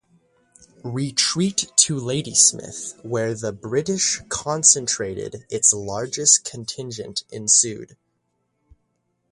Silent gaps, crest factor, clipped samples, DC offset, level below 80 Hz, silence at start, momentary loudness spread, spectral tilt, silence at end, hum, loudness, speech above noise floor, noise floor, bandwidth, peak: none; 22 dB; under 0.1%; under 0.1%; -58 dBFS; 0.85 s; 16 LU; -2 dB/octave; 1.45 s; none; -19 LUFS; 50 dB; -72 dBFS; 11.5 kHz; 0 dBFS